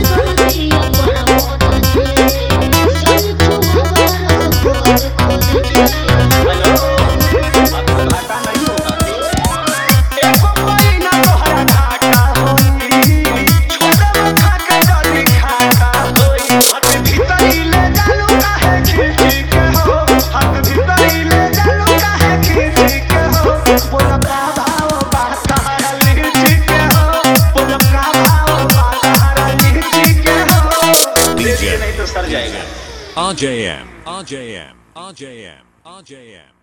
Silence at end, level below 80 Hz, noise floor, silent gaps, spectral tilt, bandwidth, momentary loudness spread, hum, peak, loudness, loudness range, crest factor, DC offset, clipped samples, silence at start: 0.5 s; -18 dBFS; -40 dBFS; none; -4.5 dB/octave; 19.5 kHz; 6 LU; none; 0 dBFS; -11 LUFS; 3 LU; 10 dB; under 0.1%; under 0.1%; 0 s